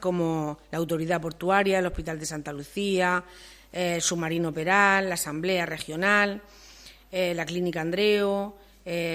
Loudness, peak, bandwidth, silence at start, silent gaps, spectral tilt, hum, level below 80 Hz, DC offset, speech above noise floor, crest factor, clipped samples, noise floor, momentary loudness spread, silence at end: -26 LUFS; -6 dBFS; 16 kHz; 0 s; none; -4 dB/octave; none; -52 dBFS; under 0.1%; 23 dB; 20 dB; under 0.1%; -50 dBFS; 12 LU; 0 s